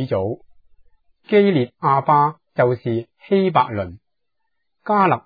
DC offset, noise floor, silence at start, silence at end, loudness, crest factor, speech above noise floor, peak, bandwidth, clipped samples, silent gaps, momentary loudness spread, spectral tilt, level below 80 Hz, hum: under 0.1%; -79 dBFS; 0 s; 0.05 s; -19 LUFS; 18 dB; 61 dB; -2 dBFS; 4.9 kHz; under 0.1%; none; 12 LU; -10.5 dB/octave; -58 dBFS; none